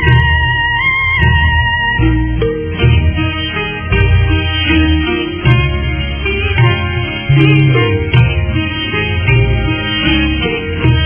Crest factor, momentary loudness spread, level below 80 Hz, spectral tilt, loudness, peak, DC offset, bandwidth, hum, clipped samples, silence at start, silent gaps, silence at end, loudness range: 12 dB; 6 LU; -18 dBFS; -9.5 dB/octave; -12 LUFS; 0 dBFS; under 0.1%; 3.5 kHz; none; under 0.1%; 0 s; none; 0 s; 1 LU